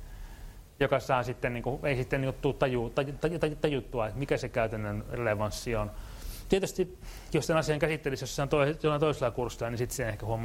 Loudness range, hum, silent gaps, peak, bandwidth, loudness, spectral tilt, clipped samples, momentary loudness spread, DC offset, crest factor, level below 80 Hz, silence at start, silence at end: 3 LU; none; none; -10 dBFS; 16 kHz; -31 LUFS; -5.5 dB/octave; under 0.1%; 8 LU; under 0.1%; 20 dB; -46 dBFS; 0 s; 0 s